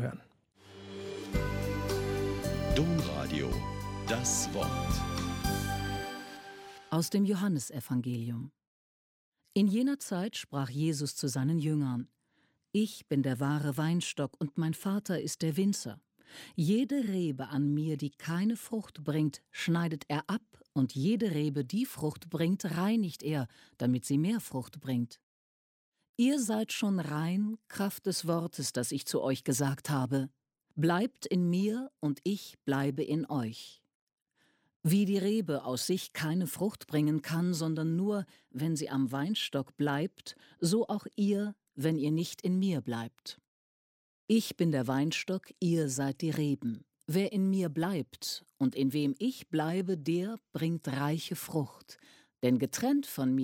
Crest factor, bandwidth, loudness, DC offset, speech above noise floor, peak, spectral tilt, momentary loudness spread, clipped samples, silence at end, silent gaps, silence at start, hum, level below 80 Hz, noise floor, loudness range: 18 dB; 16.5 kHz; -33 LUFS; under 0.1%; 42 dB; -16 dBFS; -5.5 dB/octave; 9 LU; under 0.1%; 0 s; 8.67-9.32 s, 25.23-25.92 s, 26.09-26.14 s, 33.95-34.07 s, 34.13-34.18 s, 34.76-34.80 s, 43.47-44.28 s; 0 s; none; -52 dBFS; -74 dBFS; 2 LU